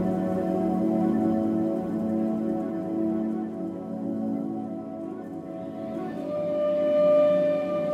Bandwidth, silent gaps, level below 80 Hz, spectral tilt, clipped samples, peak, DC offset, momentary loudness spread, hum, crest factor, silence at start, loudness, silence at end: 8.6 kHz; none; -60 dBFS; -9 dB/octave; under 0.1%; -12 dBFS; under 0.1%; 13 LU; none; 14 dB; 0 s; -27 LUFS; 0 s